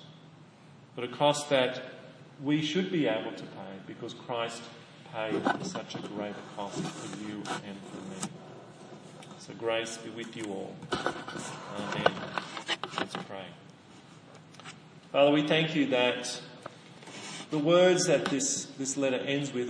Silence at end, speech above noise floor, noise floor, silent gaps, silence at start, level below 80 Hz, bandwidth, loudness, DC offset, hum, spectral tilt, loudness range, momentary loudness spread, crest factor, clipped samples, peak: 0 s; 24 dB; -54 dBFS; none; 0 s; -74 dBFS; 10.5 kHz; -31 LUFS; under 0.1%; none; -4 dB/octave; 10 LU; 22 LU; 26 dB; under 0.1%; -6 dBFS